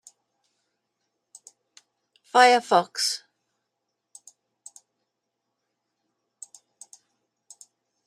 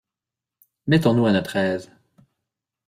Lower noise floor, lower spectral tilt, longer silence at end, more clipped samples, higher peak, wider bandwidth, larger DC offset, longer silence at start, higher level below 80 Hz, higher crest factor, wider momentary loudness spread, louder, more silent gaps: second, -81 dBFS vs -88 dBFS; second, -1.5 dB/octave vs -7 dB/octave; first, 4.9 s vs 1 s; neither; about the same, -2 dBFS vs -4 dBFS; about the same, 14.5 kHz vs 15 kHz; neither; first, 2.35 s vs 0.85 s; second, -88 dBFS vs -58 dBFS; first, 26 dB vs 18 dB; first, 28 LU vs 12 LU; about the same, -21 LUFS vs -21 LUFS; neither